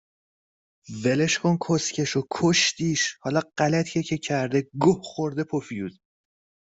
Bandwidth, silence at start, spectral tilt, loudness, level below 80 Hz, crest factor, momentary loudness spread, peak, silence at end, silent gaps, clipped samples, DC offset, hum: 8.2 kHz; 0.9 s; -4.5 dB/octave; -24 LUFS; -62 dBFS; 20 dB; 8 LU; -6 dBFS; 0.75 s; none; under 0.1%; under 0.1%; none